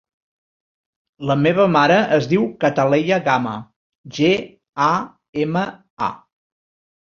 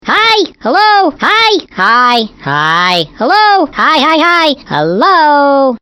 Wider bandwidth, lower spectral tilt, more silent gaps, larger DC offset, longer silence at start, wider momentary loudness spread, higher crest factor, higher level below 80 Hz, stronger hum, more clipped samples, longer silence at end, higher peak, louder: second, 7.2 kHz vs 16.5 kHz; first, -6.5 dB/octave vs -4 dB/octave; first, 3.76-4.04 s, 4.69-4.73 s, 5.29-5.33 s, 5.90-5.97 s vs none; neither; first, 1.2 s vs 0.05 s; first, 14 LU vs 5 LU; first, 18 dB vs 8 dB; second, -58 dBFS vs -48 dBFS; neither; second, under 0.1% vs 0.6%; first, 0.85 s vs 0.05 s; about the same, -2 dBFS vs 0 dBFS; second, -18 LUFS vs -8 LUFS